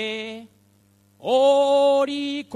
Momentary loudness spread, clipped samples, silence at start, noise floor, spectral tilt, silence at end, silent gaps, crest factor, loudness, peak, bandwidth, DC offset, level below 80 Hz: 17 LU; under 0.1%; 0 s; -59 dBFS; -3.5 dB/octave; 0 s; none; 14 dB; -20 LUFS; -8 dBFS; 10.5 kHz; under 0.1%; -74 dBFS